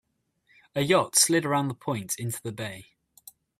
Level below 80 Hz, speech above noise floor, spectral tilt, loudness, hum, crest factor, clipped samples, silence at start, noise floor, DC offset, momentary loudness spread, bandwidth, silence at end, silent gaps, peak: -66 dBFS; 42 dB; -3 dB/octave; -25 LUFS; none; 22 dB; under 0.1%; 0.75 s; -68 dBFS; under 0.1%; 16 LU; 16 kHz; 0.8 s; none; -8 dBFS